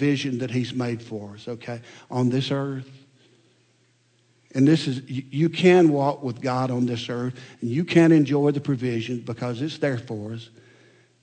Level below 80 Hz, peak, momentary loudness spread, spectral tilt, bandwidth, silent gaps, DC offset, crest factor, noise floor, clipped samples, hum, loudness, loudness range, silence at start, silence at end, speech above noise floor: -68 dBFS; -6 dBFS; 17 LU; -7 dB/octave; 9.2 kHz; none; under 0.1%; 18 dB; -63 dBFS; under 0.1%; none; -23 LUFS; 9 LU; 0 s; 0.75 s; 40 dB